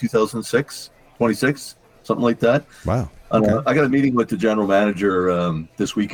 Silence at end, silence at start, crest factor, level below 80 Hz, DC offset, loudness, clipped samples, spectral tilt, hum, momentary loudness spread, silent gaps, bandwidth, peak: 0 s; 0 s; 16 dB; -46 dBFS; under 0.1%; -20 LUFS; under 0.1%; -6 dB/octave; none; 8 LU; none; 19.5 kHz; -4 dBFS